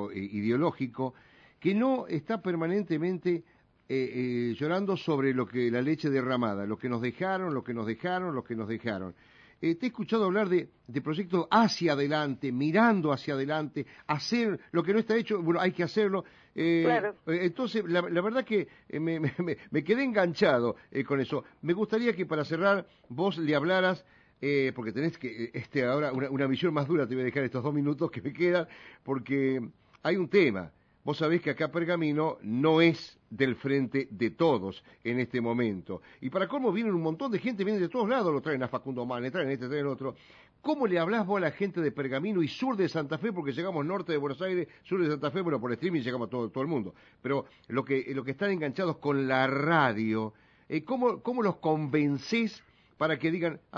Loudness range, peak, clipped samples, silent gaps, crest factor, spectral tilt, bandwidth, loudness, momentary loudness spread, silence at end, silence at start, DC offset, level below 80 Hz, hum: 3 LU; -10 dBFS; under 0.1%; none; 20 dB; -7 dB/octave; 7.2 kHz; -30 LUFS; 9 LU; 0 s; 0 s; under 0.1%; -72 dBFS; none